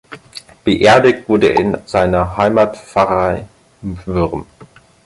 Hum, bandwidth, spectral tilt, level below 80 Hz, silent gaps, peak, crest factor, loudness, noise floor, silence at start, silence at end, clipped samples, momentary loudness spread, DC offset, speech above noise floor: none; 11.5 kHz; -6 dB/octave; -36 dBFS; none; 0 dBFS; 14 dB; -14 LUFS; -43 dBFS; 0.1 s; 0.4 s; under 0.1%; 18 LU; under 0.1%; 30 dB